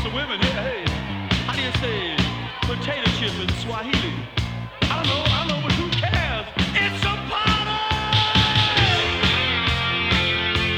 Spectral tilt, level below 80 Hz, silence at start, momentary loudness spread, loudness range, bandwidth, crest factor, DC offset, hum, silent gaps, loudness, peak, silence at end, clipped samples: -4.5 dB/octave; -34 dBFS; 0 s; 8 LU; 5 LU; 14.5 kHz; 20 dB; under 0.1%; none; none; -21 LUFS; -2 dBFS; 0 s; under 0.1%